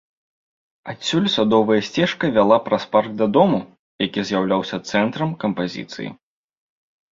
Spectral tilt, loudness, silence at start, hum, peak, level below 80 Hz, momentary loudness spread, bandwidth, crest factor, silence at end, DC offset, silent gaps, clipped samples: -5.5 dB/octave; -19 LUFS; 0.85 s; none; -2 dBFS; -58 dBFS; 13 LU; 7.8 kHz; 20 dB; 1 s; under 0.1%; 3.79-3.99 s; under 0.1%